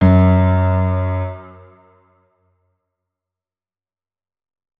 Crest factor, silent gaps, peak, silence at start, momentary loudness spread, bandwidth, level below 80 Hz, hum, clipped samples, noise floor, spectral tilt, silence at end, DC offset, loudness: 18 dB; none; -2 dBFS; 0 s; 15 LU; 3.8 kHz; -38 dBFS; none; under 0.1%; under -90 dBFS; -11.5 dB/octave; 3.3 s; under 0.1%; -16 LUFS